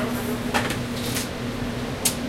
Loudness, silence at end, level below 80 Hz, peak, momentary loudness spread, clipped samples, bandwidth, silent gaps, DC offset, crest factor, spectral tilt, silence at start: -26 LUFS; 0 s; -42 dBFS; -4 dBFS; 5 LU; under 0.1%; 16.5 kHz; none; under 0.1%; 22 dB; -3.5 dB/octave; 0 s